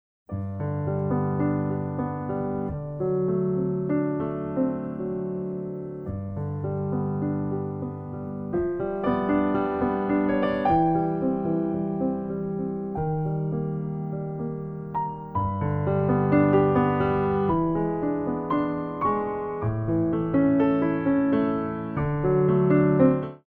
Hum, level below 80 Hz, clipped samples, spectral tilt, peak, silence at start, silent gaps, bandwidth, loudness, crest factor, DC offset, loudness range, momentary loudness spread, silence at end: none; -48 dBFS; under 0.1%; -11.5 dB/octave; -6 dBFS; 0.3 s; none; 4.3 kHz; -26 LUFS; 18 dB; under 0.1%; 6 LU; 10 LU; 0.1 s